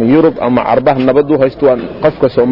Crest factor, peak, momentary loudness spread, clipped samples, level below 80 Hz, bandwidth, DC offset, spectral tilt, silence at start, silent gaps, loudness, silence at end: 10 dB; 0 dBFS; 3 LU; under 0.1%; -40 dBFS; 5.8 kHz; under 0.1%; -10 dB/octave; 0 s; none; -11 LUFS; 0 s